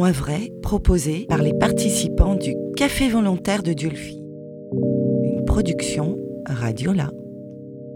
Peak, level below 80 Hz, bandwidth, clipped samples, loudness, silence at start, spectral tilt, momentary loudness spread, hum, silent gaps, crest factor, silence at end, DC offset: 0 dBFS; -30 dBFS; 17.5 kHz; under 0.1%; -21 LUFS; 0 s; -5.5 dB/octave; 16 LU; 50 Hz at -45 dBFS; none; 20 dB; 0 s; under 0.1%